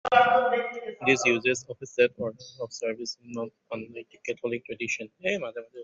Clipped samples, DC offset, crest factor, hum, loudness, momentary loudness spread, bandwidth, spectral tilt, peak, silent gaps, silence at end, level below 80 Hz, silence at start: under 0.1%; under 0.1%; 22 dB; none; -27 LUFS; 16 LU; 8 kHz; -3.5 dB/octave; -6 dBFS; none; 0 s; -70 dBFS; 0.05 s